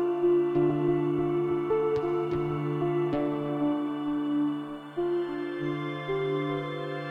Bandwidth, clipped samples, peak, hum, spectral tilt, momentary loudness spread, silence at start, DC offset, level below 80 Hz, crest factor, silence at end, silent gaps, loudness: 5.2 kHz; under 0.1%; -14 dBFS; none; -9 dB/octave; 7 LU; 0 s; under 0.1%; -58 dBFS; 14 dB; 0 s; none; -29 LUFS